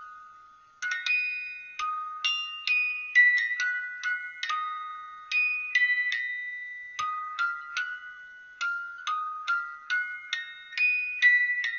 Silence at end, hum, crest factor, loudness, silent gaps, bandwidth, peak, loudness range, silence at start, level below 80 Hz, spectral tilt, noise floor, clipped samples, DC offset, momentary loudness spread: 0 s; none; 18 dB; -27 LUFS; none; 7.4 kHz; -10 dBFS; 7 LU; 0 s; -80 dBFS; 7.5 dB/octave; -54 dBFS; under 0.1%; under 0.1%; 16 LU